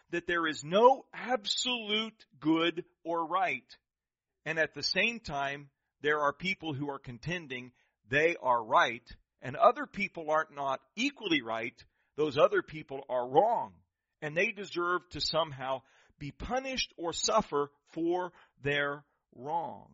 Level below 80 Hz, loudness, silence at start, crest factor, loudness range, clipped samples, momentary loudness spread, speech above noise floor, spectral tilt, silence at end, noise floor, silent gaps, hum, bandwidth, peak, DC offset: -62 dBFS; -31 LUFS; 0.1 s; 22 dB; 4 LU; under 0.1%; 15 LU; over 58 dB; -2 dB/octave; 0.15 s; under -90 dBFS; none; none; 7.6 kHz; -10 dBFS; under 0.1%